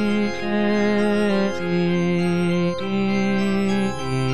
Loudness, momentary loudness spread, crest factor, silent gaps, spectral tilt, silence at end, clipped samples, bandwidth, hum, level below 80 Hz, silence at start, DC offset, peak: -21 LUFS; 3 LU; 12 dB; none; -7 dB/octave; 0 s; under 0.1%; 10.5 kHz; none; -46 dBFS; 0 s; 2%; -10 dBFS